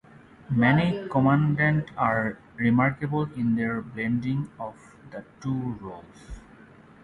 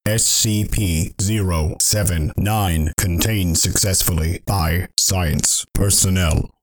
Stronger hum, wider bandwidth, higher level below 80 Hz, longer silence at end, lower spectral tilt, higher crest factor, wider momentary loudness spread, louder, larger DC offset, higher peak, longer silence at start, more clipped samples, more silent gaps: neither; second, 9.8 kHz vs 19.5 kHz; second, -52 dBFS vs -28 dBFS; first, 0.65 s vs 0.15 s; first, -8.5 dB/octave vs -3.5 dB/octave; about the same, 20 dB vs 18 dB; first, 21 LU vs 6 LU; second, -25 LUFS vs -17 LUFS; neither; second, -6 dBFS vs 0 dBFS; first, 0.5 s vs 0.05 s; neither; neither